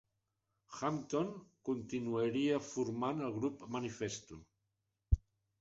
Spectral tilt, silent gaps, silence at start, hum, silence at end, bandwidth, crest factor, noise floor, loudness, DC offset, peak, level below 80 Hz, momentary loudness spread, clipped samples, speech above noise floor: -6.5 dB/octave; none; 0.7 s; none; 0.4 s; 8 kHz; 24 dB; -86 dBFS; -39 LUFS; under 0.1%; -16 dBFS; -48 dBFS; 10 LU; under 0.1%; 48 dB